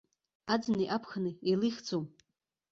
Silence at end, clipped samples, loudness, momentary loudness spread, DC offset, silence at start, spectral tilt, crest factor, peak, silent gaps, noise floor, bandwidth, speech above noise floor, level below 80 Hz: 0.65 s; under 0.1%; -33 LUFS; 8 LU; under 0.1%; 0.45 s; -6 dB/octave; 18 dB; -16 dBFS; none; -84 dBFS; 7.6 kHz; 52 dB; -72 dBFS